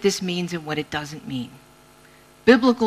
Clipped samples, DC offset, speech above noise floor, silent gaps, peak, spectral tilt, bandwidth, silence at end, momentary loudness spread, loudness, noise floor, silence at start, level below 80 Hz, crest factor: under 0.1%; under 0.1%; 30 dB; none; -2 dBFS; -5 dB/octave; 14.5 kHz; 0 s; 16 LU; -23 LUFS; -51 dBFS; 0 s; -58 dBFS; 20 dB